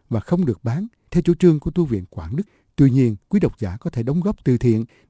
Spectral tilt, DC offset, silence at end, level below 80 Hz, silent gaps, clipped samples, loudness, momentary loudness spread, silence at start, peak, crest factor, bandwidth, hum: -9.5 dB/octave; under 0.1%; 0.25 s; -40 dBFS; none; under 0.1%; -20 LUFS; 12 LU; 0.1 s; -2 dBFS; 16 dB; 8 kHz; none